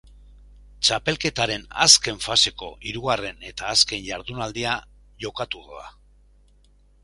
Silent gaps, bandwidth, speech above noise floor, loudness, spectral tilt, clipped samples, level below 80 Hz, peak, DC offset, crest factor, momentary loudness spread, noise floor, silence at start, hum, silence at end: none; 16 kHz; 32 dB; -21 LUFS; -1 dB/octave; under 0.1%; -48 dBFS; 0 dBFS; under 0.1%; 26 dB; 19 LU; -56 dBFS; 0.8 s; 50 Hz at -50 dBFS; 1.15 s